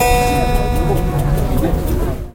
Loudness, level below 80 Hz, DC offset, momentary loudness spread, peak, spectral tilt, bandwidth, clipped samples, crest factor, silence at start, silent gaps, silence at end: -17 LUFS; -18 dBFS; under 0.1%; 4 LU; 0 dBFS; -6 dB/octave; 16.5 kHz; under 0.1%; 14 dB; 0 s; none; 0.05 s